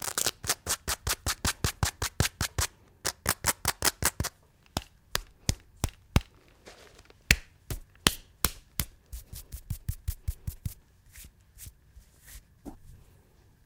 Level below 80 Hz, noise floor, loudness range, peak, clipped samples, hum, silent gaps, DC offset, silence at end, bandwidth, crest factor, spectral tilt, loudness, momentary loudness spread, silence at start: -42 dBFS; -60 dBFS; 13 LU; 0 dBFS; under 0.1%; none; none; under 0.1%; 0.7 s; 19 kHz; 34 dB; -2.5 dB/octave; -31 LUFS; 22 LU; 0 s